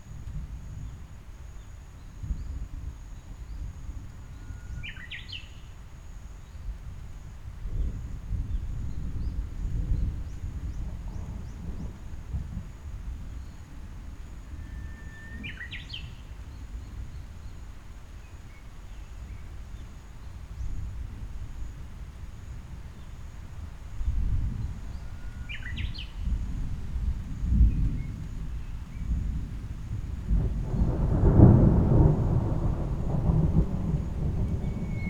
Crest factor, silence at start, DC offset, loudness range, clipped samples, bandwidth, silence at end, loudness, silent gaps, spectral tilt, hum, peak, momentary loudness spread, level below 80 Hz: 28 dB; 0 s; under 0.1%; 19 LU; under 0.1%; 8.4 kHz; 0 s; -30 LUFS; none; -8.5 dB/octave; none; -2 dBFS; 20 LU; -34 dBFS